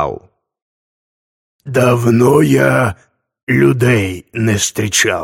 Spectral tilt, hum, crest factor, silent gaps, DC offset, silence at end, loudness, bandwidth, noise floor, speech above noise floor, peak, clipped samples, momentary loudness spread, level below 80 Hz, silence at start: -5 dB/octave; none; 14 dB; 0.62-1.59 s, 3.43-3.47 s; under 0.1%; 0 s; -13 LUFS; 16.5 kHz; -34 dBFS; 22 dB; 0 dBFS; under 0.1%; 10 LU; -46 dBFS; 0 s